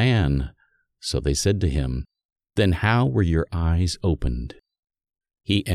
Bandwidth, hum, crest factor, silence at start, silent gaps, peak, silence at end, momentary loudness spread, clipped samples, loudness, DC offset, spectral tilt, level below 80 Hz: 13.5 kHz; none; 18 dB; 0 s; 2.25-2.29 s, 4.79-4.83 s; -6 dBFS; 0 s; 13 LU; under 0.1%; -23 LUFS; under 0.1%; -5.5 dB/octave; -32 dBFS